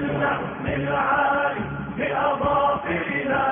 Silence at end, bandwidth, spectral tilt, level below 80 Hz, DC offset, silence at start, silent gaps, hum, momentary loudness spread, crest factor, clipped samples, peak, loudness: 0 s; 3.7 kHz; -10 dB/octave; -46 dBFS; under 0.1%; 0 s; none; none; 7 LU; 12 dB; under 0.1%; -10 dBFS; -23 LUFS